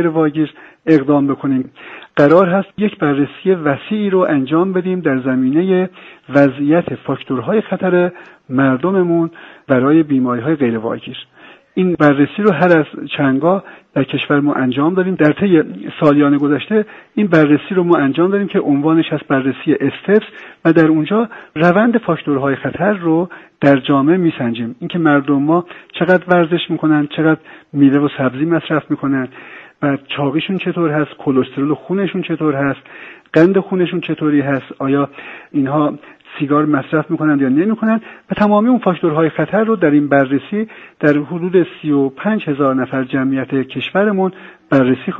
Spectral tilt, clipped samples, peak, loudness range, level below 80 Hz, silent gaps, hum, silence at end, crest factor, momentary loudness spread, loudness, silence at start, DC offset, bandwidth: -9 dB/octave; under 0.1%; 0 dBFS; 3 LU; -56 dBFS; none; none; 0 s; 14 dB; 9 LU; -15 LUFS; 0 s; under 0.1%; 5.2 kHz